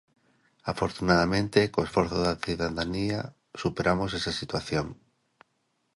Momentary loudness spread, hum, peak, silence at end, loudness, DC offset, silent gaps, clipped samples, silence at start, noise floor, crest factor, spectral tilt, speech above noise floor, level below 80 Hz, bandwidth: 10 LU; none; -6 dBFS; 1 s; -28 LUFS; under 0.1%; none; under 0.1%; 0.65 s; -75 dBFS; 22 dB; -5.5 dB/octave; 47 dB; -48 dBFS; 11.5 kHz